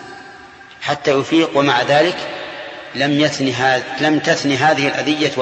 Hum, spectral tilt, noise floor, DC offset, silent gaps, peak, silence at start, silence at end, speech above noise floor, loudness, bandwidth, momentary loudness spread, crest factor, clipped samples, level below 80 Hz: none; -4.5 dB/octave; -39 dBFS; under 0.1%; none; 0 dBFS; 0 s; 0 s; 24 dB; -16 LUFS; 8.6 kHz; 14 LU; 16 dB; under 0.1%; -58 dBFS